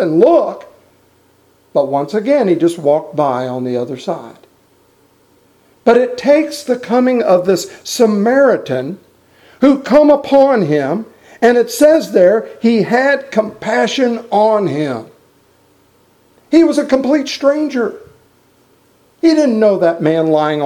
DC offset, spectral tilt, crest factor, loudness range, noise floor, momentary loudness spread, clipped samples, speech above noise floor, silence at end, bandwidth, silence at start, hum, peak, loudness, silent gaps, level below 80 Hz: under 0.1%; -5.5 dB/octave; 14 dB; 5 LU; -52 dBFS; 10 LU; under 0.1%; 40 dB; 0 s; 15.5 kHz; 0 s; none; 0 dBFS; -13 LUFS; none; -56 dBFS